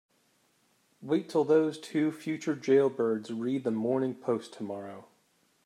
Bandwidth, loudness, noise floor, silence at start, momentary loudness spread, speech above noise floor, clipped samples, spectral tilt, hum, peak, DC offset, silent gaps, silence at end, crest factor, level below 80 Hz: 13 kHz; -30 LUFS; -70 dBFS; 1 s; 14 LU; 41 dB; under 0.1%; -6.5 dB/octave; none; -14 dBFS; under 0.1%; none; 0.65 s; 18 dB; -84 dBFS